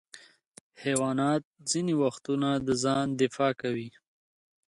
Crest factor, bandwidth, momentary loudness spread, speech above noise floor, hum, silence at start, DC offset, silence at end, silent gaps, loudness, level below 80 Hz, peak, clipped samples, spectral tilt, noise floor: 18 dB; 11.5 kHz; 7 LU; 26 dB; none; 0.15 s; under 0.1%; 0.8 s; 0.47-0.55 s, 0.61-0.70 s, 1.45-1.54 s; -29 LUFS; -66 dBFS; -12 dBFS; under 0.1%; -5 dB/octave; -54 dBFS